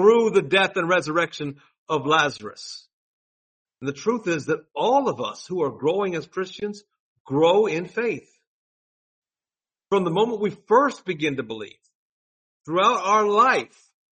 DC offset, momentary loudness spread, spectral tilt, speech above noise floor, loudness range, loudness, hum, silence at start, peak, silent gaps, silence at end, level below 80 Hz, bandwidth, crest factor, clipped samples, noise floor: under 0.1%; 16 LU; -5 dB/octave; over 68 dB; 4 LU; -22 LUFS; none; 0 s; -4 dBFS; 1.78-1.86 s, 2.93-3.65 s, 7.00-7.25 s, 8.47-9.22 s, 11.95-12.61 s; 0.5 s; -68 dBFS; 8.4 kHz; 20 dB; under 0.1%; under -90 dBFS